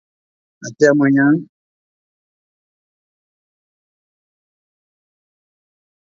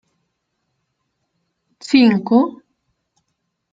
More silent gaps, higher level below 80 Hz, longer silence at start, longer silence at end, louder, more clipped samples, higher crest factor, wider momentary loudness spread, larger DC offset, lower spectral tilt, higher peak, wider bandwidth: neither; about the same, -68 dBFS vs -64 dBFS; second, 0.6 s vs 1.9 s; first, 4.6 s vs 1.2 s; about the same, -14 LUFS vs -15 LUFS; neither; about the same, 22 dB vs 18 dB; first, 21 LU vs 12 LU; neither; about the same, -6.5 dB/octave vs -6 dB/octave; about the same, 0 dBFS vs -2 dBFS; about the same, 7.4 kHz vs 7.8 kHz